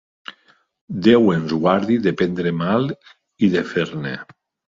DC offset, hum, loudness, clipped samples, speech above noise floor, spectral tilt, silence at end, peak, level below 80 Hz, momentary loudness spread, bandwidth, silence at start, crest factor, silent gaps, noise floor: under 0.1%; none; -19 LUFS; under 0.1%; 39 dB; -7.5 dB/octave; 0.45 s; -2 dBFS; -54 dBFS; 19 LU; 7.6 kHz; 0.3 s; 18 dB; 0.81-0.88 s; -58 dBFS